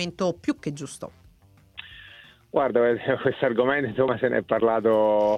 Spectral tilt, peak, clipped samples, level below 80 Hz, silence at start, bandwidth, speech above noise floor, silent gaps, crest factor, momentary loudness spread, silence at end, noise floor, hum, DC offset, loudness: -6 dB/octave; -8 dBFS; under 0.1%; -60 dBFS; 0 s; 12 kHz; 33 dB; none; 16 dB; 21 LU; 0 s; -56 dBFS; none; under 0.1%; -24 LUFS